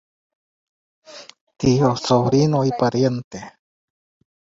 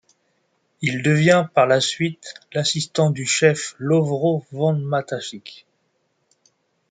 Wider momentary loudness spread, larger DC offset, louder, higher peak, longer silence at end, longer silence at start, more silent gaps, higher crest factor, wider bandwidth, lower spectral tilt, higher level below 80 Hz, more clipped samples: first, 22 LU vs 13 LU; neither; about the same, -19 LUFS vs -20 LUFS; about the same, -4 dBFS vs -2 dBFS; second, 0.9 s vs 1.35 s; first, 1.1 s vs 0.8 s; first, 1.41-1.47 s, 3.24-3.31 s vs none; about the same, 18 dB vs 20 dB; second, 7.8 kHz vs 9.6 kHz; first, -6.5 dB/octave vs -4.5 dB/octave; first, -52 dBFS vs -64 dBFS; neither